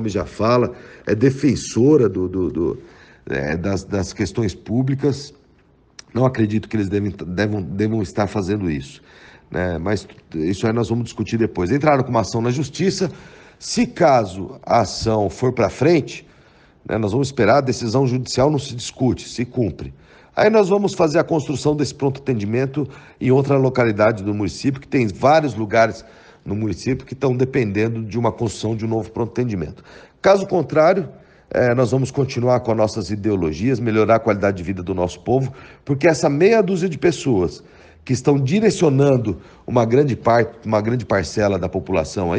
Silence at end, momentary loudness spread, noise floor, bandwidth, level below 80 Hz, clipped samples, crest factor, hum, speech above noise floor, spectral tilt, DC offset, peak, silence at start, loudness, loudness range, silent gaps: 0 s; 10 LU; -54 dBFS; 9.8 kHz; -48 dBFS; under 0.1%; 18 dB; none; 36 dB; -6.5 dB/octave; under 0.1%; -2 dBFS; 0 s; -19 LUFS; 4 LU; none